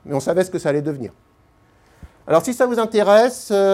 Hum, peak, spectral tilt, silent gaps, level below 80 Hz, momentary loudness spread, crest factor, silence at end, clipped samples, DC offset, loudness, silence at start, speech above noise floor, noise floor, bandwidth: none; -2 dBFS; -5 dB/octave; none; -56 dBFS; 11 LU; 18 dB; 0 s; under 0.1%; under 0.1%; -18 LUFS; 0.05 s; 38 dB; -55 dBFS; 15.5 kHz